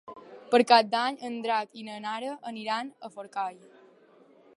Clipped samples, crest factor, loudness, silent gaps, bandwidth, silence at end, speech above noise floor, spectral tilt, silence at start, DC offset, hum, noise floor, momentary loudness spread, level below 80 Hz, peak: under 0.1%; 24 dB; -28 LUFS; none; 11.5 kHz; 1.05 s; 30 dB; -3.5 dB/octave; 0.05 s; under 0.1%; none; -58 dBFS; 19 LU; -84 dBFS; -4 dBFS